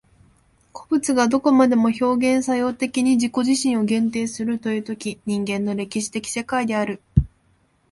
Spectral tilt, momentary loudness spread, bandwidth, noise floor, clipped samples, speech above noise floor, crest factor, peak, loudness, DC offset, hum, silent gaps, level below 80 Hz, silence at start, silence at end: -5.5 dB/octave; 9 LU; 11.5 kHz; -62 dBFS; under 0.1%; 41 dB; 20 dB; -2 dBFS; -21 LUFS; under 0.1%; none; none; -40 dBFS; 0.75 s; 0.65 s